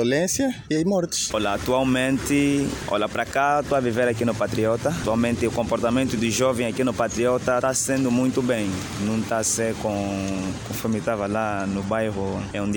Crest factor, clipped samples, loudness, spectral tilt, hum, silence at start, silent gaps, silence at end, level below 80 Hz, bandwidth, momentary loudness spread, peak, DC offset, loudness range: 14 dB; under 0.1%; -23 LUFS; -4.5 dB/octave; none; 0 s; none; 0 s; -46 dBFS; 17.5 kHz; 5 LU; -8 dBFS; under 0.1%; 3 LU